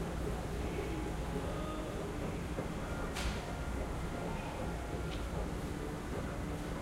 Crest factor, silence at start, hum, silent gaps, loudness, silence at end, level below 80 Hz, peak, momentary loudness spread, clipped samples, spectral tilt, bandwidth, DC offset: 14 dB; 0 s; none; none; -40 LUFS; 0 s; -44 dBFS; -24 dBFS; 2 LU; under 0.1%; -6 dB/octave; 16 kHz; under 0.1%